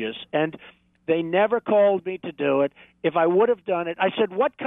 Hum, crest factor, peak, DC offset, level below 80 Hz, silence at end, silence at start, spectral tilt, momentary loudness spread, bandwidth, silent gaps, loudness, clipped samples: none; 14 dB; -8 dBFS; under 0.1%; -70 dBFS; 0 s; 0 s; -9 dB/octave; 8 LU; 3.9 kHz; none; -23 LUFS; under 0.1%